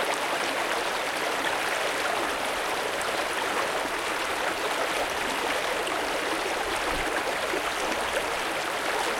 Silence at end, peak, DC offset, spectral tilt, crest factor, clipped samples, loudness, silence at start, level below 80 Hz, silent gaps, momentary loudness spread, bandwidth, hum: 0 s; -12 dBFS; under 0.1%; -1.5 dB/octave; 16 dB; under 0.1%; -27 LUFS; 0 s; -52 dBFS; none; 1 LU; 16.5 kHz; none